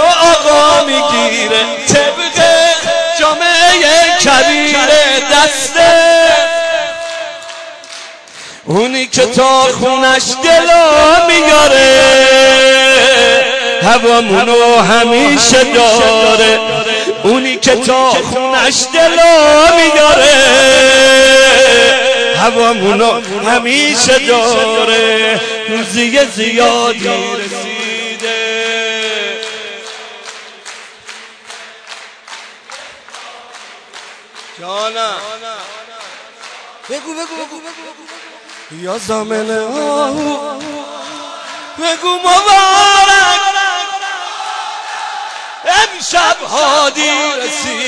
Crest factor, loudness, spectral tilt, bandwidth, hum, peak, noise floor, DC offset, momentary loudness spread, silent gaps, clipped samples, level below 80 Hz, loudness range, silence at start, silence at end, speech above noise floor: 10 dB; -8 LUFS; -1.5 dB/octave; 11 kHz; none; 0 dBFS; -34 dBFS; under 0.1%; 21 LU; none; under 0.1%; -42 dBFS; 17 LU; 0 s; 0 s; 25 dB